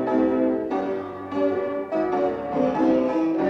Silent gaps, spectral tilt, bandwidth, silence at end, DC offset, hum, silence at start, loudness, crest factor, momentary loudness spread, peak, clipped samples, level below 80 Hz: none; -8 dB/octave; 6.6 kHz; 0 s; under 0.1%; none; 0 s; -24 LUFS; 14 dB; 6 LU; -10 dBFS; under 0.1%; -56 dBFS